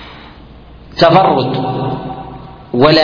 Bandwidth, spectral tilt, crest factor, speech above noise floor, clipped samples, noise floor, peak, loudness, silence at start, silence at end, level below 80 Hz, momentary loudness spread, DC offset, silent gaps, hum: 5.4 kHz; -7.5 dB/octave; 14 dB; 25 dB; 0.1%; -36 dBFS; 0 dBFS; -13 LUFS; 0 s; 0 s; -40 dBFS; 22 LU; under 0.1%; none; none